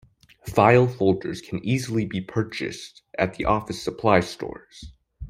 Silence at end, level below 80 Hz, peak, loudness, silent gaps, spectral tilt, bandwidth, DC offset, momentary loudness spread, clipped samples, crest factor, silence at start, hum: 0 s; -48 dBFS; -2 dBFS; -23 LUFS; none; -6.5 dB/octave; 15.5 kHz; under 0.1%; 18 LU; under 0.1%; 22 dB; 0.45 s; none